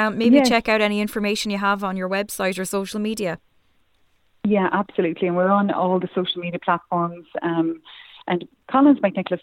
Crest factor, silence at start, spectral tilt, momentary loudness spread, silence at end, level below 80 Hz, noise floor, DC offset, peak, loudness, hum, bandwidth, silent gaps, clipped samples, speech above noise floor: 18 dB; 0 s; -5.5 dB/octave; 11 LU; 0.05 s; -58 dBFS; -61 dBFS; under 0.1%; -2 dBFS; -21 LUFS; none; 17 kHz; none; under 0.1%; 41 dB